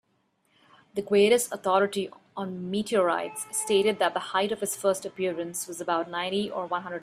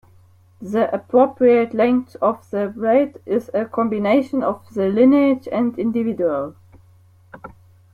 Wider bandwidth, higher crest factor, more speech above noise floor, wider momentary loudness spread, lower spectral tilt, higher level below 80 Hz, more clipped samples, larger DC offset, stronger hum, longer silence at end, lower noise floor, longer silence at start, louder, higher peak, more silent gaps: first, 16 kHz vs 7 kHz; about the same, 18 dB vs 16 dB; first, 44 dB vs 33 dB; about the same, 11 LU vs 10 LU; second, -3.5 dB/octave vs -8 dB/octave; second, -70 dBFS vs -60 dBFS; neither; neither; neither; second, 0 s vs 0.45 s; first, -71 dBFS vs -51 dBFS; first, 0.95 s vs 0.6 s; second, -27 LUFS vs -19 LUFS; second, -10 dBFS vs -2 dBFS; neither